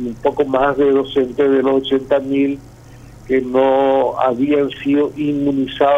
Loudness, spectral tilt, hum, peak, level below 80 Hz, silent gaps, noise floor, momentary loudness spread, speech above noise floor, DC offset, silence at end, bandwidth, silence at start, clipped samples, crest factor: -16 LUFS; -7 dB/octave; none; 0 dBFS; -46 dBFS; none; -39 dBFS; 5 LU; 24 dB; under 0.1%; 0 s; 8 kHz; 0 s; under 0.1%; 16 dB